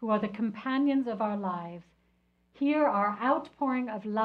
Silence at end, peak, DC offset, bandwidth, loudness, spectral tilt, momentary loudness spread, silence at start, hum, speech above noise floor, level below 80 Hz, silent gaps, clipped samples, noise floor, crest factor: 0 s; -14 dBFS; under 0.1%; 5.4 kHz; -30 LUFS; -8.5 dB/octave; 8 LU; 0 s; 60 Hz at -70 dBFS; 41 dB; -72 dBFS; none; under 0.1%; -70 dBFS; 16 dB